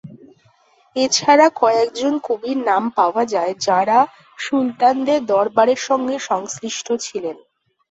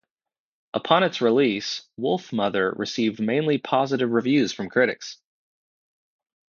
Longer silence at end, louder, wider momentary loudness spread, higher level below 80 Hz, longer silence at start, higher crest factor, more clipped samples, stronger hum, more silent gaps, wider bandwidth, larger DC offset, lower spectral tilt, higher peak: second, 0.55 s vs 1.35 s; first, -18 LUFS vs -23 LUFS; about the same, 11 LU vs 9 LU; about the same, -66 dBFS vs -68 dBFS; second, 0.05 s vs 0.75 s; about the same, 16 dB vs 20 dB; neither; neither; neither; first, 8.2 kHz vs 7.2 kHz; neither; second, -3 dB/octave vs -5 dB/octave; about the same, -2 dBFS vs -4 dBFS